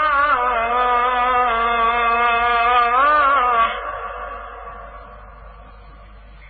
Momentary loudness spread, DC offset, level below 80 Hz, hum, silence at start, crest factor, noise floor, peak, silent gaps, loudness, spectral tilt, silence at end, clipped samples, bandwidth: 19 LU; under 0.1%; -42 dBFS; none; 0 s; 12 dB; -41 dBFS; -6 dBFS; none; -16 LUFS; -8 dB/octave; 0 s; under 0.1%; 4.7 kHz